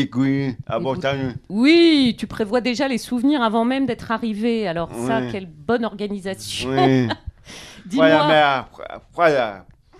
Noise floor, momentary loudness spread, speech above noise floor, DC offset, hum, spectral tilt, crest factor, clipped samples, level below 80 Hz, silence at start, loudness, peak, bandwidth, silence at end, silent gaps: -40 dBFS; 14 LU; 21 dB; under 0.1%; none; -5.5 dB/octave; 18 dB; under 0.1%; -48 dBFS; 0 s; -19 LUFS; -2 dBFS; 13.5 kHz; 0.35 s; none